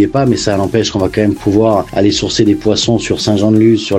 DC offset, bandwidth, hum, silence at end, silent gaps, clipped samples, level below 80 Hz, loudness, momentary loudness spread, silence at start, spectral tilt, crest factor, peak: under 0.1%; 12.5 kHz; none; 0 s; none; under 0.1%; -36 dBFS; -12 LUFS; 4 LU; 0 s; -5.5 dB/octave; 12 dB; 0 dBFS